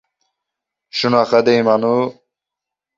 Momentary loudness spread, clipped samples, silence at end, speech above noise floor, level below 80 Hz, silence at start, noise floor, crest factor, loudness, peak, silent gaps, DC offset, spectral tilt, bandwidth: 10 LU; under 0.1%; 0.85 s; 70 dB; -62 dBFS; 0.95 s; -84 dBFS; 18 dB; -16 LUFS; -2 dBFS; none; under 0.1%; -6 dB/octave; 7.6 kHz